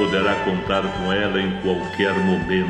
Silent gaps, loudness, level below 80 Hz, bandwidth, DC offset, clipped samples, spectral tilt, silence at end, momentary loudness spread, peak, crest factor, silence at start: none; -21 LUFS; -44 dBFS; 9.2 kHz; under 0.1%; under 0.1%; -6.5 dB/octave; 0 s; 3 LU; -6 dBFS; 14 dB; 0 s